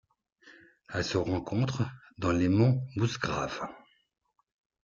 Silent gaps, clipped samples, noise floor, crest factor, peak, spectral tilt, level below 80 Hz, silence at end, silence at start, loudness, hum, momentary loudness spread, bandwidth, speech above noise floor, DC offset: none; under 0.1%; -60 dBFS; 18 dB; -12 dBFS; -6.5 dB/octave; -58 dBFS; 1.05 s; 0.45 s; -30 LUFS; none; 11 LU; 7.4 kHz; 31 dB; under 0.1%